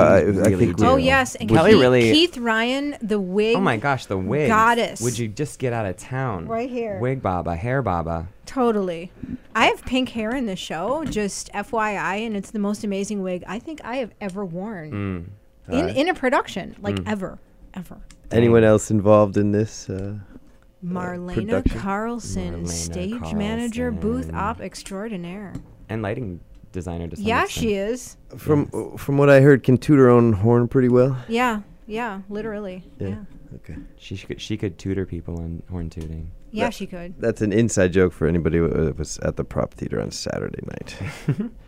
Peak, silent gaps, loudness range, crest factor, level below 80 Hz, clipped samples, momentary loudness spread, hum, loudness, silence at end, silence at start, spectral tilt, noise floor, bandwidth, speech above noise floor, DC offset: -2 dBFS; none; 11 LU; 20 dB; -42 dBFS; under 0.1%; 17 LU; none; -21 LUFS; 0.1 s; 0 s; -6 dB/octave; -47 dBFS; 16 kHz; 25 dB; under 0.1%